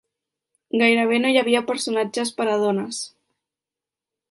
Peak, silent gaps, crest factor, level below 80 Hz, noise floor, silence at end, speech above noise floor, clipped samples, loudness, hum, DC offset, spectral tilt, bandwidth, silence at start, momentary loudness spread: -4 dBFS; none; 18 dB; -74 dBFS; -89 dBFS; 1.25 s; 69 dB; under 0.1%; -21 LUFS; none; under 0.1%; -3.5 dB/octave; 11.5 kHz; 0.75 s; 11 LU